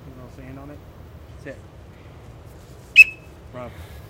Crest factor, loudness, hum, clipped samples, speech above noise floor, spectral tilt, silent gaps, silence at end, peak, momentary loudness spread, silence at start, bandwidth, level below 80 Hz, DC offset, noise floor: 24 dB; -12 LUFS; none; under 0.1%; 5 dB; -2.5 dB/octave; none; 1 s; 0 dBFS; 29 LU; 2.95 s; 16 kHz; -46 dBFS; under 0.1%; -43 dBFS